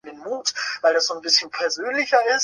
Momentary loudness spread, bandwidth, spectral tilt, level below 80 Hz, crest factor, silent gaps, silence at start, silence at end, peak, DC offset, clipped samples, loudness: 7 LU; 11 kHz; 1 dB/octave; -74 dBFS; 18 dB; none; 0.05 s; 0 s; -4 dBFS; under 0.1%; under 0.1%; -21 LUFS